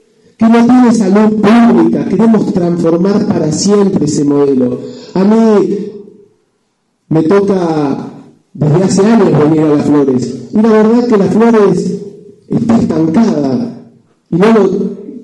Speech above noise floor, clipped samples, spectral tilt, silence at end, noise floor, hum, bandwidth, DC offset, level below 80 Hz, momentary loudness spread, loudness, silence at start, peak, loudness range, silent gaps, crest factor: 53 dB; under 0.1%; -7 dB/octave; 0 s; -61 dBFS; none; 10.5 kHz; under 0.1%; -48 dBFS; 10 LU; -10 LUFS; 0.4 s; 0 dBFS; 4 LU; none; 10 dB